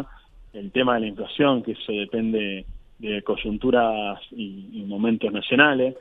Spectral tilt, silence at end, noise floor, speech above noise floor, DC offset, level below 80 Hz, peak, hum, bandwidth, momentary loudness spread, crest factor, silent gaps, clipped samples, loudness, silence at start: -8 dB/octave; 0 s; -47 dBFS; 24 dB; under 0.1%; -48 dBFS; 0 dBFS; none; 4 kHz; 17 LU; 24 dB; none; under 0.1%; -23 LUFS; 0 s